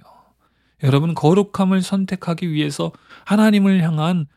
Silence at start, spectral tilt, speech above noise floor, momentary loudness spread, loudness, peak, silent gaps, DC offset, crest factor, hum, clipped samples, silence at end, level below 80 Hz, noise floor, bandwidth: 0.8 s; -7 dB/octave; 45 dB; 9 LU; -18 LUFS; 0 dBFS; none; under 0.1%; 18 dB; none; under 0.1%; 0.1 s; -60 dBFS; -62 dBFS; 13.5 kHz